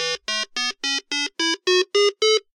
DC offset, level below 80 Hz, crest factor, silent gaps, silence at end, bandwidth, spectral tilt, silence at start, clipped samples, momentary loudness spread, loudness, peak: under 0.1%; -68 dBFS; 16 dB; none; 0.15 s; 12.5 kHz; 0 dB/octave; 0 s; under 0.1%; 7 LU; -21 LUFS; -6 dBFS